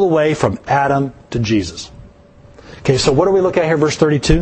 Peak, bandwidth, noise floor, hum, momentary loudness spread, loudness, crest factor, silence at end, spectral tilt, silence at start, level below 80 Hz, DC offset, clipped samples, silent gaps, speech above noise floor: 0 dBFS; 8.8 kHz; -43 dBFS; none; 9 LU; -15 LUFS; 16 dB; 0 s; -5.5 dB/octave; 0 s; -30 dBFS; under 0.1%; under 0.1%; none; 29 dB